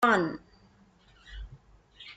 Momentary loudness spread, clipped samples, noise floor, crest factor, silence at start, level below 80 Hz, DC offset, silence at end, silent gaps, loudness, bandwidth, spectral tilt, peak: 24 LU; under 0.1%; -61 dBFS; 22 dB; 0 s; -52 dBFS; under 0.1%; 0.05 s; none; -27 LUFS; 9.4 kHz; -5.5 dB/octave; -10 dBFS